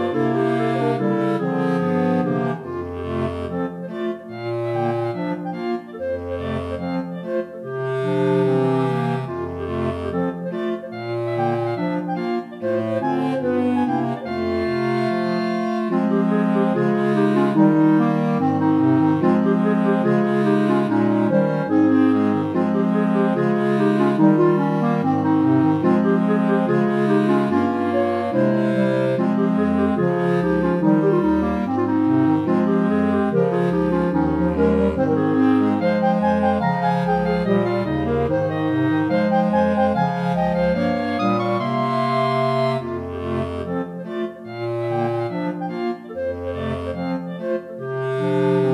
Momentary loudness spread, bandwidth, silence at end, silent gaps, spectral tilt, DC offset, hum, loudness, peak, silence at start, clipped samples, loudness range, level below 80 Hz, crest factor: 9 LU; 10.5 kHz; 0 s; none; -9 dB/octave; under 0.1%; none; -20 LUFS; -4 dBFS; 0 s; under 0.1%; 8 LU; -46 dBFS; 16 dB